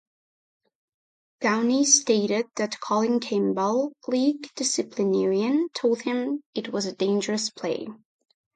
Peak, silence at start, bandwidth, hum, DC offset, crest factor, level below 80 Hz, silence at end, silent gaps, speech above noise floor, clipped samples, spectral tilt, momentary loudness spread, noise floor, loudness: -4 dBFS; 1.4 s; 9.4 kHz; none; under 0.1%; 20 dB; -74 dBFS; 0.6 s; 6.46-6.53 s; over 66 dB; under 0.1%; -3 dB/octave; 10 LU; under -90 dBFS; -24 LUFS